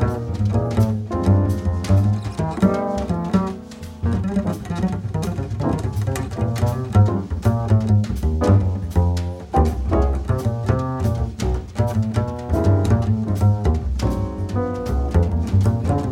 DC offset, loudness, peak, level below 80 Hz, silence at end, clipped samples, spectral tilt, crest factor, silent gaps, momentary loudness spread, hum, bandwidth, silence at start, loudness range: under 0.1%; -21 LUFS; -4 dBFS; -28 dBFS; 0 s; under 0.1%; -8 dB/octave; 16 dB; none; 7 LU; none; 13 kHz; 0 s; 3 LU